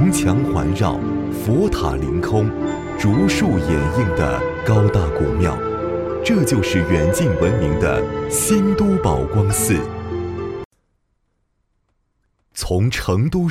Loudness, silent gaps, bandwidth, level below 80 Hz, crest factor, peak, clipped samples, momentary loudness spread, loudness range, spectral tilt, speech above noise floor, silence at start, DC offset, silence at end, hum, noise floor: -18 LUFS; 10.65-10.71 s; 16 kHz; -32 dBFS; 16 dB; -2 dBFS; under 0.1%; 7 LU; 7 LU; -6 dB/octave; 50 dB; 0 s; under 0.1%; 0 s; none; -67 dBFS